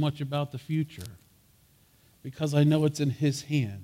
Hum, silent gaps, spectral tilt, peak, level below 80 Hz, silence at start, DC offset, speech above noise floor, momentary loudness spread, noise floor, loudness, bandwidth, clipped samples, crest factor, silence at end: none; none; -6.5 dB/octave; -12 dBFS; -64 dBFS; 0 s; under 0.1%; 34 dB; 21 LU; -62 dBFS; -28 LUFS; 15.5 kHz; under 0.1%; 16 dB; 0 s